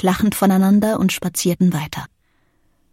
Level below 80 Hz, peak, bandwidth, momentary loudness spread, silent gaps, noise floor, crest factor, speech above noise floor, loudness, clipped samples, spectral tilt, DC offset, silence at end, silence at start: -48 dBFS; -4 dBFS; 17 kHz; 11 LU; none; -62 dBFS; 14 dB; 45 dB; -17 LUFS; under 0.1%; -5.5 dB/octave; under 0.1%; 0.85 s; 0 s